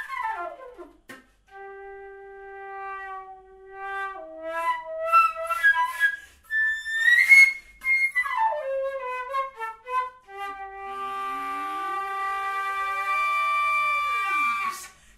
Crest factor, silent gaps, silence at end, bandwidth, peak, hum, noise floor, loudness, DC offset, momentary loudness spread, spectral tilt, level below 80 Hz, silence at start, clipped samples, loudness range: 22 dB; none; 0.25 s; 16 kHz; -4 dBFS; none; -49 dBFS; -23 LUFS; under 0.1%; 19 LU; 0 dB/octave; -62 dBFS; 0 s; under 0.1%; 18 LU